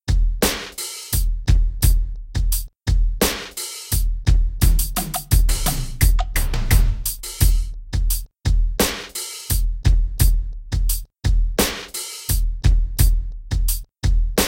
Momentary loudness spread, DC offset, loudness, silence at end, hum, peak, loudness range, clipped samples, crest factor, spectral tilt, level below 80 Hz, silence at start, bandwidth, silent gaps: 8 LU; under 0.1%; -22 LUFS; 0 s; none; -4 dBFS; 2 LU; under 0.1%; 16 dB; -4 dB/octave; -20 dBFS; 0.05 s; 17 kHz; none